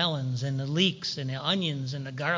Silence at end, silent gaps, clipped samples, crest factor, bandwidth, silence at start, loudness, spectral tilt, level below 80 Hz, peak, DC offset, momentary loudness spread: 0 s; none; under 0.1%; 18 dB; 7.6 kHz; 0 s; -29 LUFS; -5 dB/octave; -66 dBFS; -12 dBFS; under 0.1%; 7 LU